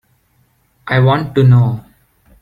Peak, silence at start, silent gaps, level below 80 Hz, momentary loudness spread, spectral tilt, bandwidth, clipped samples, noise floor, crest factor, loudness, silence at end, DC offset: -2 dBFS; 0.85 s; none; -46 dBFS; 15 LU; -9 dB/octave; 5 kHz; under 0.1%; -57 dBFS; 12 dB; -12 LUFS; 0.6 s; under 0.1%